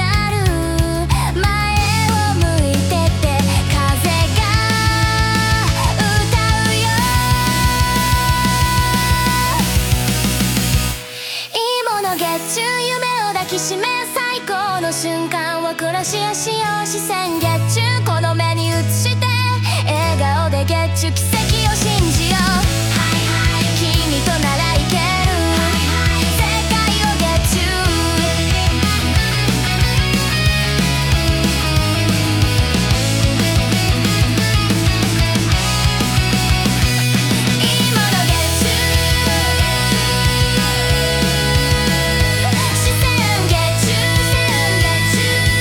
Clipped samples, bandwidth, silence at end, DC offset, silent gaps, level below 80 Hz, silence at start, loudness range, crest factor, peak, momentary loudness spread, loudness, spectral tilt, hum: under 0.1%; 19 kHz; 0 s; under 0.1%; none; -26 dBFS; 0 s; 4 LU; 14 dB; 0 dBFS; 4 LU; -15 LUFS; -4 dB/octave; none